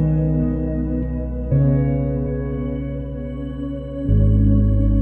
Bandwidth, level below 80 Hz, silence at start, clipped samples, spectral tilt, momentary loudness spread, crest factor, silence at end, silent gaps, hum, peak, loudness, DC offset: 3.2 kHz; -24 dBFS; 0 s; under 0.1%; -12.5 dB/octave; 12 LU; 12 dB; 0 s; none; none; -6 dBFS; -21 LUFS; under 0.1%